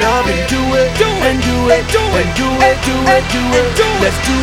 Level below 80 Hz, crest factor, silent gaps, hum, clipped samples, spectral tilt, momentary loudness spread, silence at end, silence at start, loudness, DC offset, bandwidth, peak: -24 dBFS; 12 dB; none; none; under 0.1%; -4.5 dB/octave; 2 LU; 0 s; 0 s; -12 LUFS; under 0.1%; 17 kHz; 0 dBFS